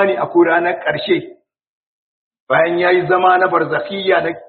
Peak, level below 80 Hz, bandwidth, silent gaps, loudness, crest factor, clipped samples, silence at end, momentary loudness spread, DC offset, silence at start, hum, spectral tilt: 0 dBFS; -60 dBFS; 4.5 kHz; 1.67-1.81 s, 1.87-2.31 s, 2.40-2.47 s; -15 LUFS; 16 dB; under 0.1%; 0.05 s; 6 LU; under 0.1%; 0 s; none; -3 dB/octave